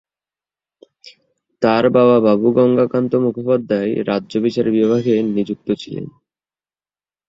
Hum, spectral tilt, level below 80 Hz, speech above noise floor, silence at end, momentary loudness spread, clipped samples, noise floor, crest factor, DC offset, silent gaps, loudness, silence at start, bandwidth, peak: none; -8 dB/octave; -58 dBFS; over 74 dB; 1.2 s; 11 LU; under 0.1%; under -90 dBFS; 16 dB; under 0.1%; none; -16 LUFS; 1.05 s; 7.6 kHz; 0 dBFS